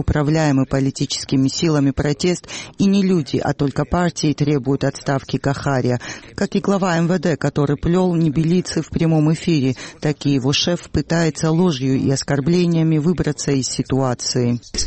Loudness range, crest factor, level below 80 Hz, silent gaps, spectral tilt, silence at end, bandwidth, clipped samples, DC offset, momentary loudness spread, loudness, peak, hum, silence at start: 2 LU; 12 dB; -38 dBFS; none; -5.5 dB/octave; 0 s; 8.8 kHz; under 0.1%; under 0.1%; 5 LU; -18 LUFS; -6 dBFS; none; 0 s